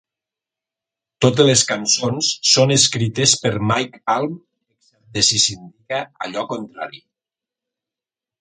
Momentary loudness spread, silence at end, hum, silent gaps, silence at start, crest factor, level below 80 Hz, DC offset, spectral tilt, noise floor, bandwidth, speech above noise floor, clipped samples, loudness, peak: 15 LU; 1.45 s; none; none; 1.2 s; 20 dB; -56 dBFS; under 0.1%; -3 dB/octave; -89 dBFS; 9.6 kHz; 71 dB; under 0.1%; -17 LUFS; 0 dBFS